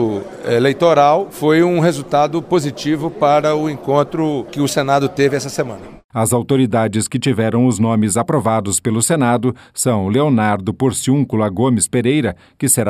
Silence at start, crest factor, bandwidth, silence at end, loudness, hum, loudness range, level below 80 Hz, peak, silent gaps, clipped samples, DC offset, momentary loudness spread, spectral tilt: 0 s; 14 dB; 15.5 kHz; 0 s; -16 LUFS; none; 2 LU; -50 dBFS; 0 dBFS; 6.04-6.09 s; under 0.1%; under 0.1%; 6 LU; -5 dB/octave